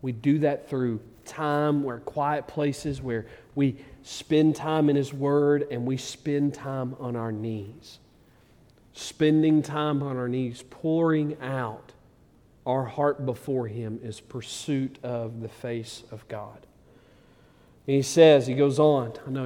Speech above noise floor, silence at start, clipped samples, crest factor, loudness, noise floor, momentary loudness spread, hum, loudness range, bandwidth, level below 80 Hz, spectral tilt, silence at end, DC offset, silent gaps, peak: 32 dB; 0.05 s; under 0.1%; 22 dB; -26 LUFS; -58 dBFS; 16 LU; none; 8 LU; 15 kHz; -60 dBFS; -6.5 dB/octave; 0 s; under 0.1%; none; -4 dBFS